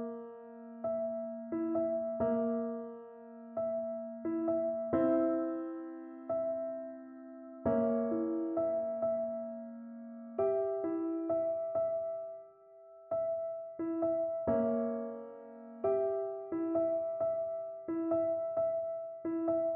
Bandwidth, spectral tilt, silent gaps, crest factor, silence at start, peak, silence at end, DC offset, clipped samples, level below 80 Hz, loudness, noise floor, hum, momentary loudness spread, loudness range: 3 kHz; -9.5 dB/octave; none; 16 dB; 0 s; -20 dBFS; 0 s; under 0.1%; under 0.1%; -70 dBFS; -35 LUFS; -57 dBFS; none; 14 LU; 2 LU